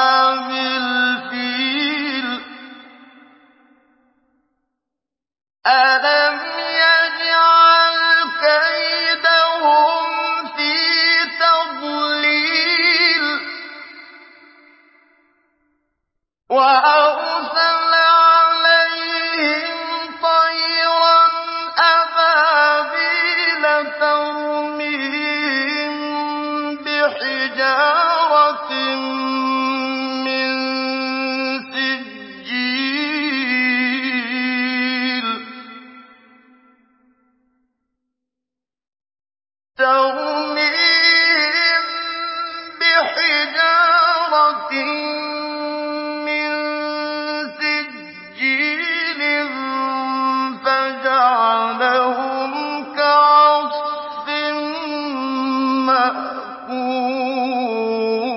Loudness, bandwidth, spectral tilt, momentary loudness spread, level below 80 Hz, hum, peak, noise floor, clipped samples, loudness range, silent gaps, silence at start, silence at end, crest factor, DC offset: -16 LUFS; 5.8 kHz; -5 dB/octave; 11 LU; -70 dBFS; none; -2 dBFS; -87 dBFS; under 0.1%; 9 LU; none; 0 s; 0 s; 16 dB; under 0.1%